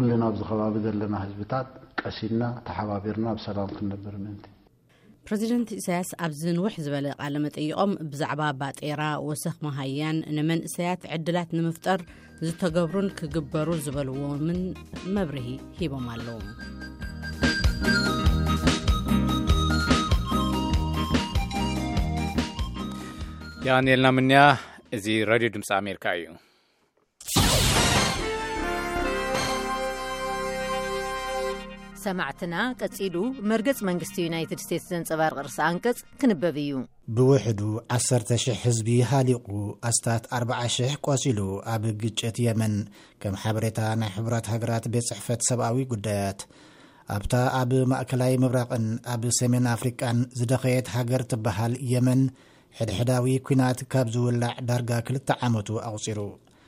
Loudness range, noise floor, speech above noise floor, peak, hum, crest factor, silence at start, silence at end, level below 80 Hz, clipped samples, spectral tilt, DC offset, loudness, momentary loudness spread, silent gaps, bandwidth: 6 LU; -68 dBFS; 42 dB; -2 dBFS; none; 24 dB; 0 s; 0.3 s; -38 dBFS; under 0.1%; -5 dB/octave; under 0.1%; -26 LUFS; 10 LU; none; 16 kHz